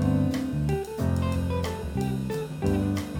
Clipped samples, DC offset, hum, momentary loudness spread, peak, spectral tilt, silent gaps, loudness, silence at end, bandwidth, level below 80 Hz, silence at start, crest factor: under 0.1%; under 0.1%; none; 4 LU; -12 dBFS; -7.5 dB/octave; none; -28 LUFS; 0 s; 17.5 kHz; -40 dBFS; 0 s; 14 dB